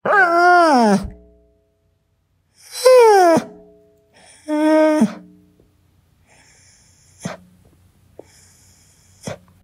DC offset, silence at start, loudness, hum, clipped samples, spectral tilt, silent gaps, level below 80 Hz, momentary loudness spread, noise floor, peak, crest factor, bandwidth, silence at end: under 0.1%; 0.05 s; -13 LUFS; none; under 0.1%; -5 dB/octave; none; -52 dBFS; 23 LU; -64 dBFS; 0 dBFS; 18 dB; 16 kHz; 0.3 s